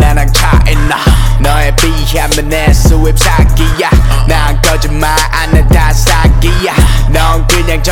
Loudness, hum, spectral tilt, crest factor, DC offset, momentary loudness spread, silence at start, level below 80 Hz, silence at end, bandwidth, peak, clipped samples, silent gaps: -9 LUFS; none; -4.5 dB/octave; 6 dB; 3%; 3 LU; 0 s; -8 dBFS; 0 s; 17 kHz; 0 dBFS; 0.7%; none